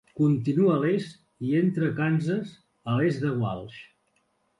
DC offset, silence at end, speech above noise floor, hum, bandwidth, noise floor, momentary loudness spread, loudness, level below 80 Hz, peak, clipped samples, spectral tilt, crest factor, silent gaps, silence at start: under 0.1%; 0.75 s; 46 dB; none; 11 kHz; -71 dBFS; 18 LU; -26 LUFS; -62 dBFS; -12 dBFS; under 0.1%; -8.5 dB/octave; 14 dB; none; 0.15 s